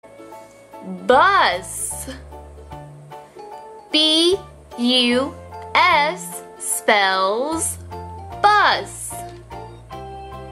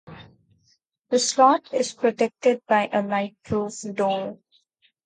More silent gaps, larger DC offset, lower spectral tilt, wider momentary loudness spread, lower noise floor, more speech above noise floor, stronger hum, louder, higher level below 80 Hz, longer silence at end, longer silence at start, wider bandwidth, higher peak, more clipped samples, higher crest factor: neither; neither; second, -2 dB/octave vs -3.5 dB/octave; first, 24 LU vs 10 LU; second, -41 dBFS vs -67 dBFS; second, 24 dB vs 44 dB; neither; first, -17 LUFS vs -23 LUFS; first, -46 dBFS vs -60 dBFS; second, 0 s vs 0.7 s; about the same, 0.05 s vs 0.1 s; first, 16 kHz vs 9.6 kHz; about the same, -2 dBFS vs -4 dBFS; neither; about the same, 20 dB vs 20 dB